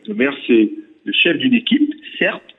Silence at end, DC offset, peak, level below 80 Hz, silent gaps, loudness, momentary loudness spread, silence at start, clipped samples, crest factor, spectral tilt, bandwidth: 0.2 s; under 0.1%; -4 dBFS; -66 dBFS; none; -16 LUFS; 7 LU; 0.1 s; under 0.1%; 14 dB; -7.5 dB/octave; 4.1 kHz